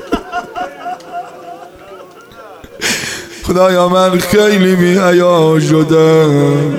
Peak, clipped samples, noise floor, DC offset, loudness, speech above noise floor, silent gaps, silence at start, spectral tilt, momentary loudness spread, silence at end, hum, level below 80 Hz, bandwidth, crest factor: 0 dBFS; under 0.1%; -35 dBFS; under 0.1%; -10 LUFS; 26 dB; none; 0 s; -5.5 dB/octave; 17 LU; 0 s; none; -40 dBFS; 16.5 kHz; 12 dB